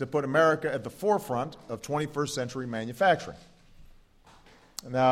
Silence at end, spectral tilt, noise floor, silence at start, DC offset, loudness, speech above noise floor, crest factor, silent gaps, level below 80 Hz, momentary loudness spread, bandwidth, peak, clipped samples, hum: 0 s; -5 dB/octave; -57 dBFS; 0 s; under 0.1%; -28 LUFS; 29 dB; 18 dB; none; -60 dBFS; 14 LU; 16 kHz; -10 dBFS; under 0.1%; none